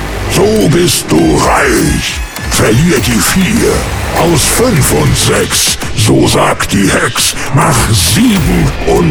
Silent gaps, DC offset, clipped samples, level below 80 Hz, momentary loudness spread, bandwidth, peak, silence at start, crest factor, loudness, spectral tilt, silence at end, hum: none; under 0.1%; under 0.1%; -22 dBFS; 4 LU; over 20 kHz; 0 dBFS; 0 s; 8 dB; -9 LUFS; -4 dB/octave; 0 s; none